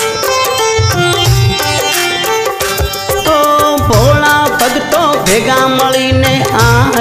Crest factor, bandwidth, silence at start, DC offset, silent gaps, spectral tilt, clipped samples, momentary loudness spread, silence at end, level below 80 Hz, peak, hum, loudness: 10 dB; 16 kHz; 0 s; under 0.1%; none; -4 dB/octave; under 0.1%; 5 LU; 0 s; -26 dBFS; 0 dBFS; none; -10 LUFS